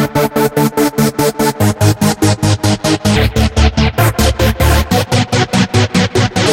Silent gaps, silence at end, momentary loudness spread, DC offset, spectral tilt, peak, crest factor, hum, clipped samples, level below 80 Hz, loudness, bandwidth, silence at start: none; 0 s; 1 LU; 0.1%; -5 dB/octave; 0 dBFS; 12 dB; none; under 0.1%; -22 dBFS; -12 LUFS; 16.5 kHz; 0 s